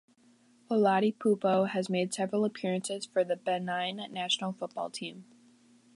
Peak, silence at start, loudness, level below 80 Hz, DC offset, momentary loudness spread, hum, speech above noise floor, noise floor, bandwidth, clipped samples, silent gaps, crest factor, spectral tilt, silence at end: -14 dBFS; 0.7 s; -31 LUFS; -82 dBFS; under 0.1%; 10 LU; none; 33 dB; -63 dBFS; 11.5 kHz; under 0.1%; none; 18 dB; -4.5 dB/octave; 0.75 s